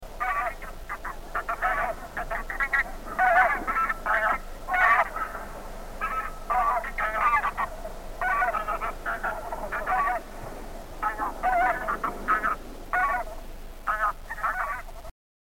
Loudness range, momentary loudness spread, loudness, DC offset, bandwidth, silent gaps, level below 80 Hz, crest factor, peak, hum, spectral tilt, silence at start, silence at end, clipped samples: 5 LU; 16 LU; -27 LUFS; 0.2%; 17 kHz; none; -40 dBFS; 18 dB; -8 dBFS; none; -4 dB/octave; 0 s; 0.4 s; under 0.1%